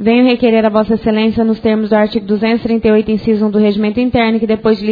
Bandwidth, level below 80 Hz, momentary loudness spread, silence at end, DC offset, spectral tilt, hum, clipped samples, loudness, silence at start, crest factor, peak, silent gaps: 5 kHz; -40 dBFS; 4 LU; 0 s; under 0.1%; -9 dB/octave; none; under 0.1%; -12 LUFS; 0 s; 12 dB; 0 dBFS; none